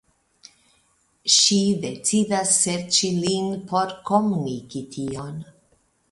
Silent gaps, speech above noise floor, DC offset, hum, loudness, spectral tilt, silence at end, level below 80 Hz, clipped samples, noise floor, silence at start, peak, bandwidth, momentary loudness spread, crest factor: none; 42 dB; under 0.1%; none; -21 LUFS; -3 dB/octave; 0.7 s; -60 dBFS; under 0.1%; -64 dBFS; 1.25 s; -4 dBFS; 11.5 kHz; 15 LU; 20 dB